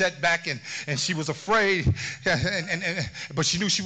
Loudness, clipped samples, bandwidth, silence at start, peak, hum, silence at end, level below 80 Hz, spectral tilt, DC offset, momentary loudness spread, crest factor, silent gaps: -25 LUFS; under 0.1%; 9.2 kHz; 0 s; -12 dBFS; none; 0 s; -46 dBFS; -3.5 dB/octave; under 0.1%; 8 LU; 14 dB; none